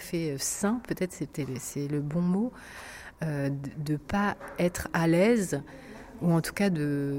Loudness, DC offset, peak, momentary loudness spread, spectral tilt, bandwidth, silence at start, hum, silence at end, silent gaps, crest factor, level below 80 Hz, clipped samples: -29 LUFS; under 0.1%; -10 dBFS; 13 LU; -5.5 dB/octave; 16.5 kHz; 0 s; none; 0 s; none; 18 dB; -54 dBFS; under 0.1%